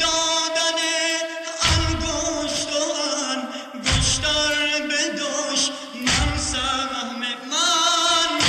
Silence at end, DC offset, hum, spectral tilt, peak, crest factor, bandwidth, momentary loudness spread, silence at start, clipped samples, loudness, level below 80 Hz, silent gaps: 0 s; under 0.1%; none; -2 dB/octave; -4 dBFS; 18 dB; 14 kHz; 8 LU; 0 s; under 0.1%; -21 LUFS; -36 dBFS; none